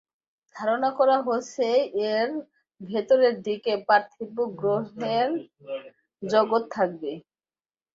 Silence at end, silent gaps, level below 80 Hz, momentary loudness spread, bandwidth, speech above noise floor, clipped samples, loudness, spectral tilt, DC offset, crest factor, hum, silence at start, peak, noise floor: 0.75 s; none; -72 dBFS; 15 LU; 7.6 kHz; over 65 dB; under 0.1%; -25 LUFS; -5 dB/octave; under 0.1%; 18 dB; none; 0.55 s; -6 dBFS; under -90 dBFS